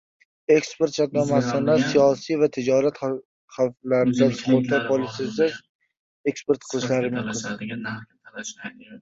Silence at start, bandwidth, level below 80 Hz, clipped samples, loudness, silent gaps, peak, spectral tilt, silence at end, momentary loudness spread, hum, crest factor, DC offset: 0.5 s; 7.8 kHz; -62 dBFS; under 0.1%; -23 LUFS; 3.25-3.48 s, 5.69-5.79 s, 5.99-6.24 s; -6 dBFS; -5.5 dB/octave; 0.05 s; 16 LU; none; 18 dB; under 0.1%